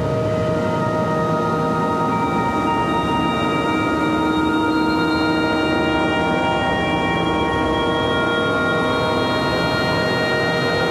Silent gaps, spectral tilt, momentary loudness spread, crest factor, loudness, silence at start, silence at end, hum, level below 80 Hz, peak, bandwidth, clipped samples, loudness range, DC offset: none; -6 dB/octave; 1 LU; 12 dB; -19 LUFS; 0 s; 0 s; none; -40 dBFS; -8 dBFS; 14 kHz; under 0.1%; 1 LU; under 0.1%